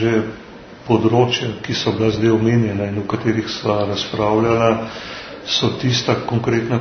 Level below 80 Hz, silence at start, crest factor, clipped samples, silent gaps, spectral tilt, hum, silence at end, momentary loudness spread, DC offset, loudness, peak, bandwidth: -48 dBFS; 0 s; 18 dB; under 0.1%; none; -6 dB/octave; none; 0 s; 13 LU; under 0.1%; -18 LUFS; 0 dBFS; 6.6 kHz